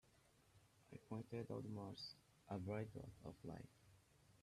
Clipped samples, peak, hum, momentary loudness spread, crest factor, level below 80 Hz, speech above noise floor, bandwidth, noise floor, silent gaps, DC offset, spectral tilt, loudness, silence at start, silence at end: under 0.1%; -34 dBFS; none; 15 LU; 20 dB; -76 dBFS; 23 dB; 13.5 kHz; -75 dBFS; none; under 0.1%; -7 dB/octave; -53 LUFS; 0.05 s; 0 s